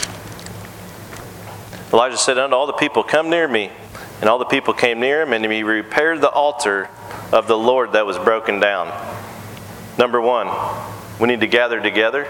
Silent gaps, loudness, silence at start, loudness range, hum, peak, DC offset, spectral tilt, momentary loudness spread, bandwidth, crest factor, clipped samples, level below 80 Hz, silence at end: none; -17 LUFS; 0 s; 3 LU; none; 0 dBFS; under 0.1%; -3.5 dB/octave; 18 LU; 17.5 kHz; 18 dB; under 0.1%; -54 dBFS; 0 s